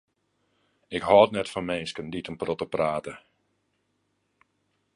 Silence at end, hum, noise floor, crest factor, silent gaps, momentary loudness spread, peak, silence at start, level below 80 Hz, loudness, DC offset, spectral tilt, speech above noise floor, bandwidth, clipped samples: 1.8 s; none; -74 dBFS; 24 dB; none; 16 LU; -4 dBFS; 0.9 s; -60 dBFS; -26 LUFS; under 0.1%; -5.5 dB/octave; 49 dB; 11.5 kHz; under 0.1%